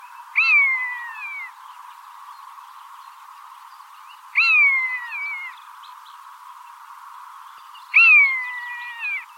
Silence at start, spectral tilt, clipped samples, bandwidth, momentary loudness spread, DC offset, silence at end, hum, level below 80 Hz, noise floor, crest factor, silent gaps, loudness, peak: 0 s; 7.5 dB/octave; under 0.1%; 16.5 kHz; 24 LU; under 0.1%; 0.05 s; none; under -90 dBFS; -44 dBFS; 18 dB; none; -16 LUFS; -6 dBFS